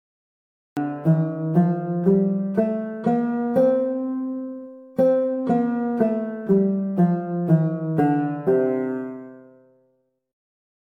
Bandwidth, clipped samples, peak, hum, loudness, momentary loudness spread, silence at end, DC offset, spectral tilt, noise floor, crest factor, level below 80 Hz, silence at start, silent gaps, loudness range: 4.1 kHz; under 0.1%; -6 dBFS; none; -22 LUFS; 10 LU; 1.55 s; under 0.1%; -11 dB/octave; -67 dBFS; 16 dB; -64 dBFS; 0.75 s; none; 2 LU